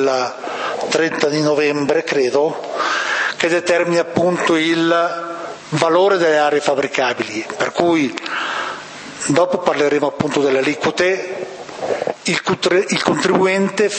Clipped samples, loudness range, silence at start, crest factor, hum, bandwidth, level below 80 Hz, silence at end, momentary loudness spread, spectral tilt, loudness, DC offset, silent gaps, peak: under 0.1%; 2 LU; 0 s; 16 dB; none; 8.8 kHz; -60 dBFS; 0 s; 9 LU; -4 dB/octave; -17 LUFS; under 0.1%; none; 0 dBFS